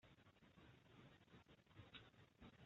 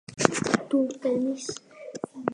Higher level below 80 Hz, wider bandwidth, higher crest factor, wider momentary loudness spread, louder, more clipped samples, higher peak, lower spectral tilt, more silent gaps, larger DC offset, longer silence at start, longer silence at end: second, -80 dBFS vs -62 dBFS; second, 7.2 kHz vs 11 kHz; second, 22 dB vs 28 dB; second, 6 LU vs 14 LU; second, -67 LUFS vs -27 LUFS; neither; second, -46 dBFS vs 0 dBFS; about the same, -4 dB/octave vs -4 dB/octave; neither; neither; about the same, 0 s vs 0.1 s; about the same, 0 s vs 0 s